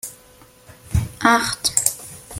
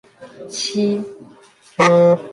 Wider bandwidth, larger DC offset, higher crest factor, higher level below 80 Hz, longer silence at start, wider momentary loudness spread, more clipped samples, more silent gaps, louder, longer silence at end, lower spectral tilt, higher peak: first, 16.5 kHz vs 11.5 kHz; neither; first, 22 dB vs 16 dB; first, -38 dBFS vs -64 dBFS; second, 0.05 s vs 0.2 s; second, 18 LU vs 21 LU; neither; neither; second, -19 LUFS vs -16 LUFS; about the same, 0 s vs 0 s; second, -3 dB/octave vs -5 dB/octave; about the same, 0 dBFS vs -2 dBFS